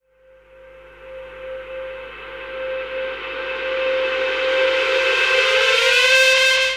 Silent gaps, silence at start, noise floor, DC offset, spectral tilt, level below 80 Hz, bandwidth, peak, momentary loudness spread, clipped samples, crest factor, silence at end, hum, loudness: none; 0.65 s; -52 dBFS; under 0.1%; 0.5 dB/octave; -52 dBFS; 16 kHz; -2 dBFS; 21 LU; under 0.1%; 18 dB; 0 s; 50 Hz at -50 dBFS; -16 LUFS